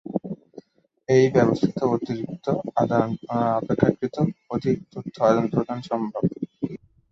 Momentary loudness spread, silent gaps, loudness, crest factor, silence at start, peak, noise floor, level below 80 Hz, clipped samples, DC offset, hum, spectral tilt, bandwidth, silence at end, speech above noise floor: 13 LU; none; -24 LUFS; 22 dB; 0.05 s; -2 dBFS; -48 dBFS; -56 dBFS; under 0.1%; under 0.1%; none; -8 dB/octave; 7.6 kHz; 0.35 s; 26 dB